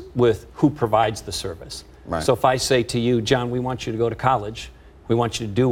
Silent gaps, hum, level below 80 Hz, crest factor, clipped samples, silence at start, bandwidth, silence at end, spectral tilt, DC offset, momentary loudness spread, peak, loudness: none; none; -44 dBFS; 20 dB; under 0.1%; 0 s; 17 kHz; 0 s; -5.5 dB/octave; under 0.1%; 14 LU; -2 dBFS; -22 LUFS